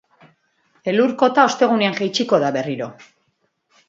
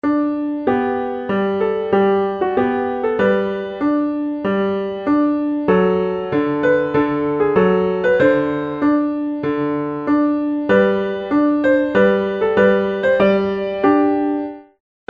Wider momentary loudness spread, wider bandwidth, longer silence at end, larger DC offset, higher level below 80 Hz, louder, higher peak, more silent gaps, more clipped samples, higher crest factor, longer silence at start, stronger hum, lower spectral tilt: first, 13 LU vs 6 LU; first, 7.8 kHz vs 5.2 kHz; first, 0.85 s vs 0.45 s; neither; second, -70 dBFS vs -50 dBFS; about the same, -18 LUFS vs -17 LUFS; about the same, 0 dBFS vs -2 dBFS; neither; neither; about the same, 20 dB vs 16 dB; first, 0.85 s vs 0.05 s; neither; second, -4.5 dB/octave vs -8.5 dB/octave